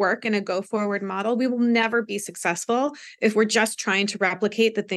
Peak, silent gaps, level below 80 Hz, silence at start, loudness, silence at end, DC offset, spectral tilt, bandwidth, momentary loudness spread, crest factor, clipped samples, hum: -4 dBFS; none; -80 dBFS; 0 s; -23 LUFS; 0 s; under 0.1%; -3.5 dB/octave; 12.5 kHz; 6 LU; 18 dB; under 0.1%; none